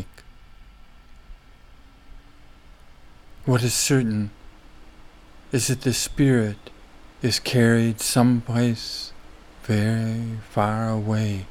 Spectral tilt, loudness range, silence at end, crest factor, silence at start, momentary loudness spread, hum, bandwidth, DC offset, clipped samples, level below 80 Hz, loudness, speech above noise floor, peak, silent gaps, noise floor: -5 dB/octave; 5 LU; 0 s; 20 dB; 0 s; 12 LU; none; 16.5 kHz; under 0.1%; under 0.1%; -46 dBFS; -22 LUFS; 26 dB; -6 dBFS; none; -48 dBFS